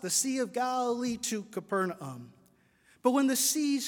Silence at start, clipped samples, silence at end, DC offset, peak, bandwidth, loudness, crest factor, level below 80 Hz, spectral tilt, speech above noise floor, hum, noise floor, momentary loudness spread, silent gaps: 0 s; under 0.1%; 0 s; under 0.1%; -12 dBFS; 18 kHz; -30 LUFS; 20 dB; -74 dBFS; -3 dB/octave; 35 dB; none; -65 dBFS; 11 LU; none